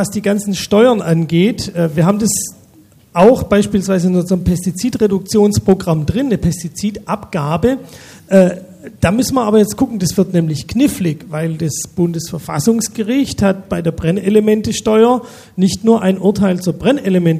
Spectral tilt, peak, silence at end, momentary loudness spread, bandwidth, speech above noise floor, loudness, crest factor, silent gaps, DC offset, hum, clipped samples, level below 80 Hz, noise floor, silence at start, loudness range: -6 dB/octave; 0 dBFS; 0 s; 8 LU; 15.5 kHz; 32 dB; -14 LUFS; 14 dB; none; under 0.1%; none; under 0.1%; -38 dBFS; -46 dBFS; 0 s; 3 LU